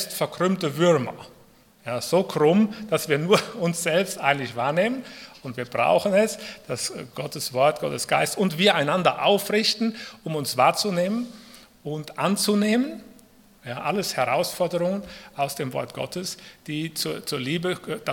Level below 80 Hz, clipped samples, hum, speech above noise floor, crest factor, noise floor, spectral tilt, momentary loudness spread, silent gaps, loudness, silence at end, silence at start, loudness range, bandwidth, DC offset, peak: -64 dBFS; under 0.1%; none; 31 dB; 22 dB; -54 dBFS; -4.5 dB/octave; 14 LU; none; -24 LUFS; 0 s; 0 s; 5 LU; 18 kHz; under 0.1%; -4 dBFS